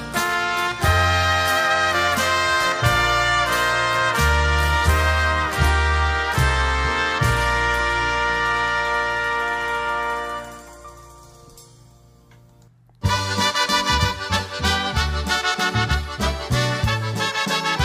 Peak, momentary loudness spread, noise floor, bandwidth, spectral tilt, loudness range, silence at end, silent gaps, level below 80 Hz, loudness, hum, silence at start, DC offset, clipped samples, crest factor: -4 dBFS; 5 LU; -52 dBFS; 16 kHz; -3.5 dB/octave; 8 LU; 0 s; none; -28 dBFS; -20 LUFS; none; 0 s; under 0.1%; under 0.1%; 16 dB